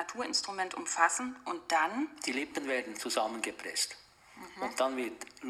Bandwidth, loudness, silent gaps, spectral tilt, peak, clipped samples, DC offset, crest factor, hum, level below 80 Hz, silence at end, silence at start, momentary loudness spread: 15 kHz; -33 LUFS; none; -0.5 dB/octave; -12 dBFS; under 0.1%; under 0.1%; 22 dB; none; -74 dBFS; 0 s; 0 s; 11 LU